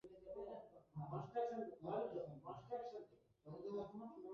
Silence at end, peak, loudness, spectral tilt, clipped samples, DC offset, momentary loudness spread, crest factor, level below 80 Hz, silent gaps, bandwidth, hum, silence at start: 0 s; -32 dBFS; -50 LUFS; -7.5 dB/octave; under 0.1%; under 0.1%; 13 LU; 18 dB; -78 dBFS; none; 7 kHz; none; 0.05 s